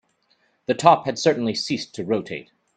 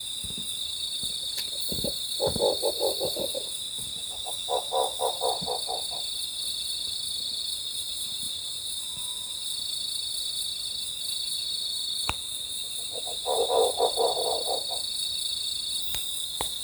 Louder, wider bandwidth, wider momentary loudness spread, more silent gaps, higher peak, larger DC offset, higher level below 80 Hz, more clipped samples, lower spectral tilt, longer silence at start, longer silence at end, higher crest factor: first, -21 LUFS vs -28 LUFS; second, 9.4 kHz vs over 20 kHz; first, 18 LU vs 6 LU; neither; first, 0 dBFS vs -8 dBFS; neither; second, -64 dBFS vs -56 dBFS; neither; first, -4.5 dB/octave vs -1 dB/octave; first, 0.7 s vs 0 s; first, 0.35 s vs 0 s; about the same, 22 dB vs 22 dB